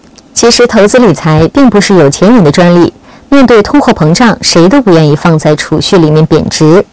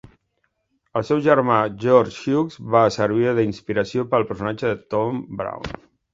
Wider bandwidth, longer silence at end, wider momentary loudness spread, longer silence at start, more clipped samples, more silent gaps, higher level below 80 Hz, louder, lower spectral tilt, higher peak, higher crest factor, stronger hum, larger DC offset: about the same, 8 kHz vs 7.8 kHz; second, 0.1 s vs 0.4 s; second, 4 LU vs 12 LU; second, 0.35 s vs 0.95 s; first, 20% vs under 0.1%; neither; first, -32 dBFS vs -52 dBFS; first, -5 LUFS vs -21 LUFS; second, -5.5 dB/octave vs -7 dB/octave; about the same, 0 dBFS vs 0 dBFS; second, 4 dB vs 20 dB; neither; neither